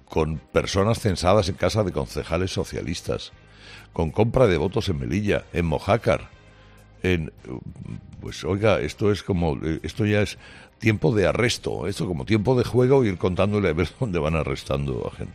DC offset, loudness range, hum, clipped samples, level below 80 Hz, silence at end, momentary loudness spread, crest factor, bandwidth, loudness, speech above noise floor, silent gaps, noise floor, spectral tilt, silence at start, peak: under 0.1%; 4 LU; none; under 0.1%; -42 dBFS; 0 s; 12 LU; 18 dB; 14 kHz; -23 LUFS; 26 dB; none; -49 dBFS; -6 dB/octave; 0.1 s; -6 dBFS